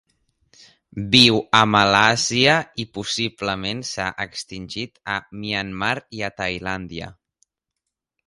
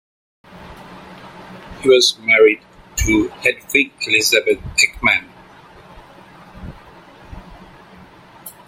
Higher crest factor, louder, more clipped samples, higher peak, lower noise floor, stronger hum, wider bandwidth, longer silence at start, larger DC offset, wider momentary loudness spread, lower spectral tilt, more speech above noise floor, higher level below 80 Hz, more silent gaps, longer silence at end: about the same, 22 dB vs 20 dB; second, -19 LUFS vs -15 LUFS; neither; about the same, 0 dBFS vs 0 dBFS; first, -82 dBFS vs -43 dBFS; neither; about the same, 16 kHz vs 16 kHz; first, 0.95 s vs 0.55 s; neither; second, 17 LU vs 26 LU; about the same, -3.5 dB/octave vs -2.5 dB/octave; first, 61 dB vs 28 dB; second, -52 dBFS vs -38 dBFS; neither; first, 1.15 s vs 0.2 s